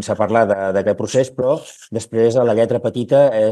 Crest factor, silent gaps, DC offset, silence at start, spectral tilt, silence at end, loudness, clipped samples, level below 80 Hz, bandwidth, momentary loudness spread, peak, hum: 16 dB; none; under 0.1%; 0 s; -6 dB/octave; 0 s; -17 LUFS; under 0.1%; -60 dBFS; 12 kHz; 9 LU; 0 dBFS; none